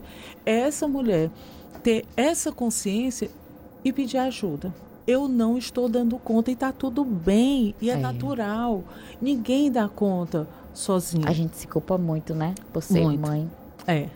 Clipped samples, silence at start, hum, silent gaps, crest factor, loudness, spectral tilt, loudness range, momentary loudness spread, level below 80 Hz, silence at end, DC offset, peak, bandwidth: under 0.1%; 0 s; none; none; 16 dB; -25 LUFS; -6 dB/octave; 2 LU; 10 LU; -50 dBFS; 0 s; under 0.1%; -8 dBFS; 17 kHz